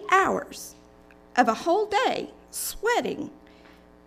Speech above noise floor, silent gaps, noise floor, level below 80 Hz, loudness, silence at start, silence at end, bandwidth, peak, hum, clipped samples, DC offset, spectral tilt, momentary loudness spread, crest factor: 27 dB; none; -53 dBFS; -56 dBFS; -25 LUFS; 0 s; 0.7 s; 16 kHz; -6 dBFS; none; under 0.1%; under 0.1%; -3 dB/octave; 17 LU; 20 dB